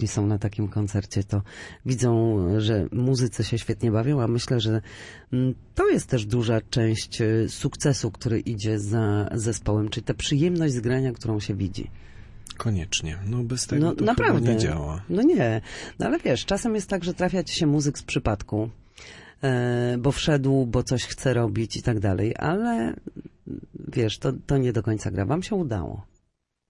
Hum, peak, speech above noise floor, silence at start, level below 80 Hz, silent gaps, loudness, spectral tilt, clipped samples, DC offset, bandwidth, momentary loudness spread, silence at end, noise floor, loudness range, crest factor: none; -8 dBFS; 49 dB; 0 s; -44 dBFS; none; -25 LUFS; -6 dB/octave; under 0.1%; under 0.1%; 11.5 kHz; 9 LU; 0.65 s; -73 dBFS; 3 LU; 16 dB